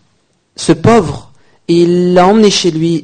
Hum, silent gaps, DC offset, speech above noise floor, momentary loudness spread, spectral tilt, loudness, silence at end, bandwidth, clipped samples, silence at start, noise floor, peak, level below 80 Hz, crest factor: none; none; under 0.1%; 49 dB; 13 LU; -5.5 dB/octave; -9 LUFS; 0 s; 9.6 kHz; 0.3%; 0.6 s; -57 dBFS; 0 dBFS; -42 dBFS; 10 dB